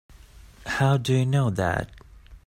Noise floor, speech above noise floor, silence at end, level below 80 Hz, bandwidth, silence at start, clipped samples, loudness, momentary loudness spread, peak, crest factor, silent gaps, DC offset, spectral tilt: -48 dBFS; 26 dB; 0.1 s; -48 dBFS; 14 kHz; 0.4 s; under 0.1%; -24 LUFS; 14 LU; -10 dBFS; 16 dB; none; under 0.1%; -6.5 dB/octave